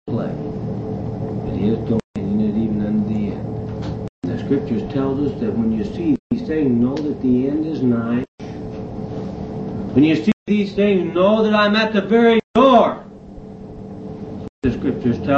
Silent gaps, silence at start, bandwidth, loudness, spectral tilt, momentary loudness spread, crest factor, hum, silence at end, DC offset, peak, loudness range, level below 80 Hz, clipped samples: 2.04-2.14 s, 4.09-4.22 s, 6.19-6.30 s, 8.28-8.38 s, 10.33-10.46 s, 12.44-12.54 s, 14.49-14.62 s; 0.05 s; 7.4 kHz; -19 LUFS; -8 dB/octave; 16 LU; 18 dB; none; 0 s; under 0.1%; -2 dBFS; 6 LU; -42 dBFS; under 0.1%